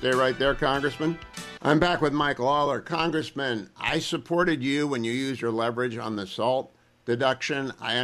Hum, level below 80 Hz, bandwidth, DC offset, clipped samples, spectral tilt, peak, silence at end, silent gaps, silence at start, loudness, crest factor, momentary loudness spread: none; -50 dBFS; 14 kHz; under 0.1%; under 0.1%; -5 dB/octave; -8 dBFS; 0 s; none; 0 s; -26 LUFS; 18 dB; 7 LU